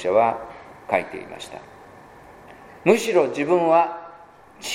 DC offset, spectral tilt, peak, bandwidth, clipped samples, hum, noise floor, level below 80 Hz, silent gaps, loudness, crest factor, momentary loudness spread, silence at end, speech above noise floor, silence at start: under 0.1%; -4.5 dB/octave; 0 dBFS; 16 kHz; under 0.1%; none; -47 dBFS; -62 dBFS; none; -20 LUFS; 22 dB; 21 LU; 0 s; 27 dB; 0 s